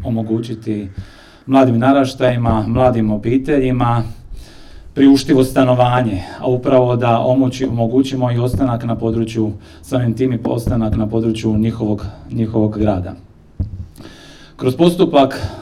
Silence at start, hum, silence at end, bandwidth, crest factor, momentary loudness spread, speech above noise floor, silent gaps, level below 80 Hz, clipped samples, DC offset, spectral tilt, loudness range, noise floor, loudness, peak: 0 s; none; 0 s; 14 kHz; 16 dB; 12 LU; 24 dB; none; -34 dBFS; under 0.1%; under 0.1%; -7.5 dB/octave; 5 LU; -39 dBFS; -16 LUFS; 0 dBFS